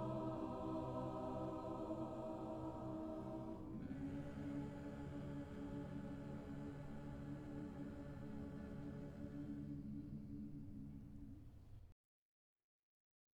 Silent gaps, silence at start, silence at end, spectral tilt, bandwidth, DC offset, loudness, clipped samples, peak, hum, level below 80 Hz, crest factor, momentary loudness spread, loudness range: none; 0 s; 1.45 s; -9 dB/octave; 16 kHz; under 0.1%; -50 LUFS; under 0.1%; -34 dBFS; none; -62 dBFS; 14 dB; 8 LU; 6 LU